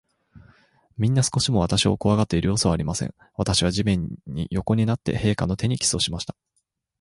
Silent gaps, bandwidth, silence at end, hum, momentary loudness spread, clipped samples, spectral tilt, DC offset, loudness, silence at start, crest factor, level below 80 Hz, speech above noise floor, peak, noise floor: none; 11.5 kHz; 0.7 s; none; 10 LU; under 0.1%; -5 dB/octave; under 0.1%; -23 LUFS; 0.35 s; 18 dB; -40 dBFS; 51 dB; -6 dBFS; -74 dBFS